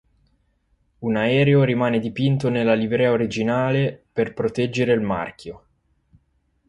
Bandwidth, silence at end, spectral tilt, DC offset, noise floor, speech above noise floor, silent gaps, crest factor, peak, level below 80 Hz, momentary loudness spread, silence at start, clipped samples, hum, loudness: 11 kHz; 1.1 s; -7.5 dB/octave; under 0.1%; -66 dBFS; 46 dB; none; 16 dB; -6 dBFS; -54 dBFS; 9 LU; 1 s; under 0.1%; none; -21 LUFS